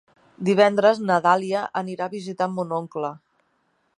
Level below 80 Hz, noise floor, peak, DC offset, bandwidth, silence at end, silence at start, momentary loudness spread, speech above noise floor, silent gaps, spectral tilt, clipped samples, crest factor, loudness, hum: -70 dBFS; -68 dBFS; -4 dBFS; under 0.1%; 11 kHz; 0.8 s; 0.4 s; 13 LU; 47 dB; none; -6 dB/octave; under 0.1%; 18 dB; -22 LUFS; none